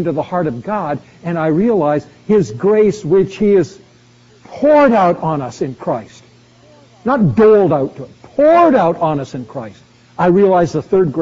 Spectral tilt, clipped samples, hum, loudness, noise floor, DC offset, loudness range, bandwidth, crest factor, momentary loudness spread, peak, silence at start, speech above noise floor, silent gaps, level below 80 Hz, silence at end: -7 dB/octave; under 0.1%; none; -14 LUFS; -47 dBFS; under 0.1%; 3 LU; 7.8 kHz; 12 dB; 15 LU; -2 dBFS; 0 s; 33 dB; none; -48 dBFS; 0 s